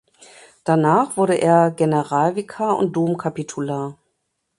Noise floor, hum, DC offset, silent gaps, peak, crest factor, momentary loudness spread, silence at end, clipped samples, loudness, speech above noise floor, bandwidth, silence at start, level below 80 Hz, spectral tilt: -73 dBFS; none; under 0.1%; none; -2 dBFS; 18 dB; 11 LU; 0.65 s; under 0.1%; -19 LUFS; 55 dB; 11.5 kHz; 0.65 s; -64 dBFS; -7 dB/octave